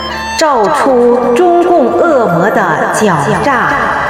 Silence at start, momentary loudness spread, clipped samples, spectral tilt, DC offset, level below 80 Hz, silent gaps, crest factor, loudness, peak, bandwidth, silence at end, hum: 0 s; 3 LU; under 0.1%; -5 dB/octave; under 0.1%; -38 dBFS; none; 10 dB; -9 LUFS; 0 dBFS; 16 kHz; 0 s; none